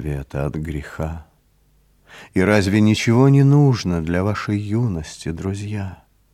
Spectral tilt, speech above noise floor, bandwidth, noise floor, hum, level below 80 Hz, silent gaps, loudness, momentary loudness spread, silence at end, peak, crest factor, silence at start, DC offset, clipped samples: -7 dB/octave; 40 dB; 12.5 kHz; -58 dBFS; none; -40 dBFS; none; -19 LUFS; 15 LU; 0.4 s; 0 dBFS; 18 dB; 0 s; under 0.1%; under 0.1%